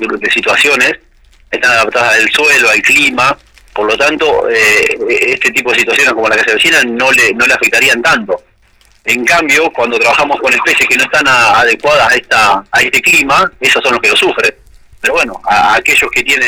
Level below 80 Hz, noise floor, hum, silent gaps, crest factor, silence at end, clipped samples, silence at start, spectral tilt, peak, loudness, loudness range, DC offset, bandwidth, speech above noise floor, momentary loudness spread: -42 dBFS; -47 dBFS; none; none; 8 dB; 0 s; under 0.1%; 0 s; -1.5 dB/octave; -2 dBFS; -8 LUFS; 2 LU; under 0.1%; over 20 kHz; 38 dB; 6 LU